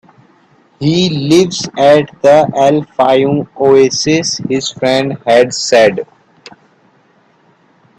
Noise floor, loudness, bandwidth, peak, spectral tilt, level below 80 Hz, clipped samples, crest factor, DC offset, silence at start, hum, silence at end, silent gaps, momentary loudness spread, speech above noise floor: -51 dBFS; -11 LUFS; 12.5 kHz; 0 dBFS; -4.5 dB/octave; -52 dBFS; under 0.1%; 12 dB; under 0.1%; 0.8 s; none; 1.95 s; none; 7 LU; 40 dB